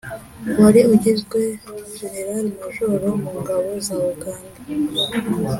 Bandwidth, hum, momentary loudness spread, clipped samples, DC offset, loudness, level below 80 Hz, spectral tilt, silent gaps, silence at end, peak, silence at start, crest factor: 16.5 kHz; none; 18 LU; under 0.1%; under 0.1%; -19 LUFS; -50 dBFS; -5.5 dB/octave; none; 0 s; -2 dBFS; 0.05 s; 18 dB